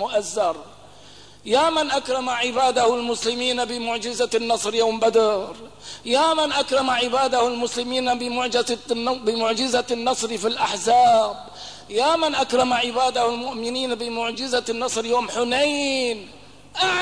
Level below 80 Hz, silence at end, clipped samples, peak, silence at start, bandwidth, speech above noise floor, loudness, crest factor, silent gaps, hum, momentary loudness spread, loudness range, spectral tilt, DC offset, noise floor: -58 dBFS; 0 s; under 0.1%; -8 dBFS; 0 s; 11 kHz; 25 dB; -21 LUFS; 14 dB; none; 50 Hz at -55 dBFS; 8 LU; 2 LU; -2 dB/octave; 0.3%; -47 dBFS